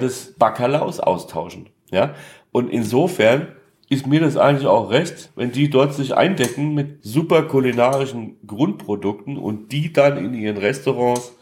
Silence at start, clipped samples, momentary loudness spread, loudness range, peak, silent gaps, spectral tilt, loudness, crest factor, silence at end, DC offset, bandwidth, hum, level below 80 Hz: 0 s; under 0.1%; 11 LU; 3 LU; -2 dBFS; none; -6 dB/octave; -19 LUFS; 18 dB; 0.1 s; under 0.1%; 16.5 kHz; none; -62 dBFS